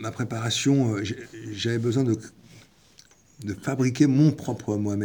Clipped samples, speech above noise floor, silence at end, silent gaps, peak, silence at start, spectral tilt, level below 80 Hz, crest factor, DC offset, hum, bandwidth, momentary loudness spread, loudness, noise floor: under 0.1%; 31 dB; 0 s; none; -6 dBFS; 0 s; -6 dB/octave; -66 dBFS; 18 dB; under 0.1%; none; over 20 kHz; 15 LU; -25 LUFS; -56 dBFS